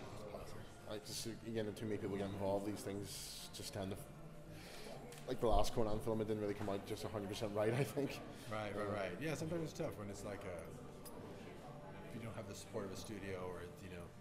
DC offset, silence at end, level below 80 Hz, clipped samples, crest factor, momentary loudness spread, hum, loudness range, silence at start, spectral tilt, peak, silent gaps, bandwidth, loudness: under 0.1%; 0 s; -54 dBFS; under 0.1%; 22 dB; 14 LU; none; 9 LU; 0 s; -5.5 dB/octave; -22 dBFS; none; 16 kHz; -44 LUFS